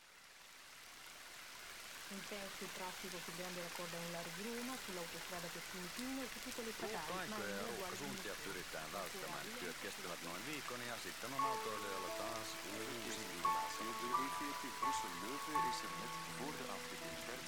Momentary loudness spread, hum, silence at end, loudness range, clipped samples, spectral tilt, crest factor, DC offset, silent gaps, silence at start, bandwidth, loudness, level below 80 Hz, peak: 10 LU; none; 0 s; 5 LU; under 0.1%; -2.5 dB/octave; 20 dB; under 0.1%; none; 0 s; 17.5 kHz; -44 LUFS; -72 dBFS; -24 dBFS